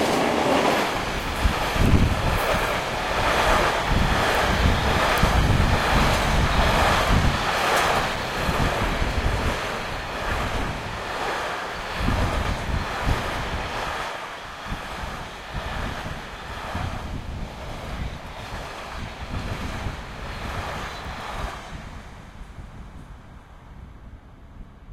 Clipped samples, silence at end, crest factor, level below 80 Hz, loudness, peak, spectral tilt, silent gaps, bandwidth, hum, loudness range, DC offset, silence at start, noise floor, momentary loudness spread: under 0.1%; 0 s; 20 dB; -30 dBFS; -24 LUFS; -4 dBFS; -4.5 dB/octave; none; 16.5 kHz; none; 13 LU; under 0.1%; 0 s; -44 dBFS; 15 LU